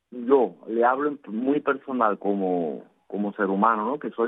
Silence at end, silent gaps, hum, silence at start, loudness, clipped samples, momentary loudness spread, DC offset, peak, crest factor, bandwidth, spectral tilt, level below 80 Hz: 0 s; none; none; 0.1 s; -24 LUFS; under 0.1%; 9 LU; under 0.1%; -4 dBFS; 20 dB; 3.9 kHz; -10 dB/octave; -82 dBFS